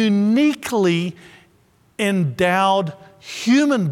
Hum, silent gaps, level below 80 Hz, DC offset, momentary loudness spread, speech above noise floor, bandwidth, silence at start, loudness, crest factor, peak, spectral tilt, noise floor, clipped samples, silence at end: none; none; -60 dBFS; under 0.1%; 14 LU; 39 dB; 16 kHz; 0 s; -18 LUFS; 16 dB; -4 dBFS; -5.5 dB/octave; -57 dBFS; under 0.1%; 0 s